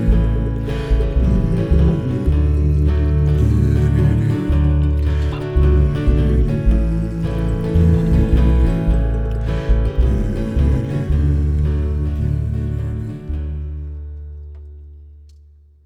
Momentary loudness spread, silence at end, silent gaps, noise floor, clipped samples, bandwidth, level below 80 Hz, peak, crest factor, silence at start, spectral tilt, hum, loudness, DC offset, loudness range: 11 LU; 0.75 s; none; -46 dBFS; under 0.1%; 5.8 kHz; -18 dBFS; -2 dBFS; 14 dB; 0 s; -9.5 dB/octave; none; -18 LUFS; under 0.1%; 6 LU